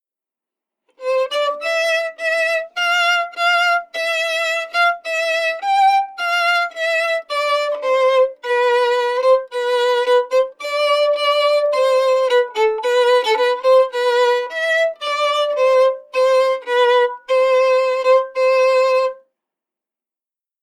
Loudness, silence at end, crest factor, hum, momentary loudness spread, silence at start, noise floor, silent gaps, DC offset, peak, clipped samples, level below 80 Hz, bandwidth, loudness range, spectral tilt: -16 LUFS; 1.5 s; 12 dB; none; 5 LU; 1 s; -89 dBFS; none; under 0.1%; -4 dBFS; under 0.1%; -68 dBFS; 13.5 kHz; 2 LU; 2.5 dB/octave